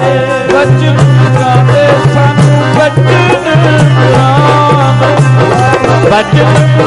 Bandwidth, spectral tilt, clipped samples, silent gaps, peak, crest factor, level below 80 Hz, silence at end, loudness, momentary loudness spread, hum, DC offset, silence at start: 11 kHz; -6.5 dB/octave; 0.2%; none; 0 dBFS; 6 dB; -34 dBFS; 0 s; -7 LUFS; 1 LU; none; under 0.1%; 0 s